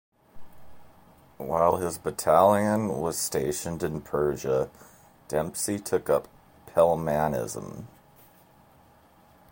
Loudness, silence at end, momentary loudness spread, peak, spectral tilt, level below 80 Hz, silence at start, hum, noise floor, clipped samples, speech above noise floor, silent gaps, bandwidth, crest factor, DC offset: -26 LUFS; 1.65 s; 11 LU; -6 dBFS; -5 dB/octave; -54 dBFS; 0.35 s; none; -57 dBFS; under 0.1%; 32 dB; none; 17 kHz; 22 dB; under 0.1%